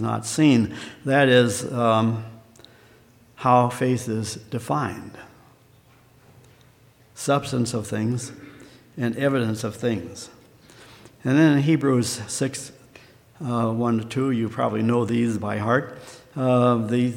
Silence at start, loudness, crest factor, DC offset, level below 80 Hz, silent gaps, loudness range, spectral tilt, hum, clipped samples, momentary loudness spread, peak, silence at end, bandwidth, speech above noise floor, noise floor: 0 s; -22 LUFS; 20 dB; under 0.1%; -62 dBFS; none; 7 LU; -6 dB/octave; none; under 0.1%; 17 LU; -4 dBFS; 0 s; 16.5 kHz; 33 dB; -55 dBFS